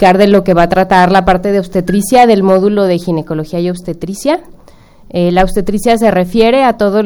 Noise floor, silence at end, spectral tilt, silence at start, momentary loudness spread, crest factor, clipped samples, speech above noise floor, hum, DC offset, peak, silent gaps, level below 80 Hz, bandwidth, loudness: -39 dBFS; 0 s; -6 dB/octave; 0 s; 10 LU; 10 dB; 0.6%; 29 dB; none; under 0.1%; 0 dBFS; none; -30 dBFS; over 20 kHz; -10 LUFS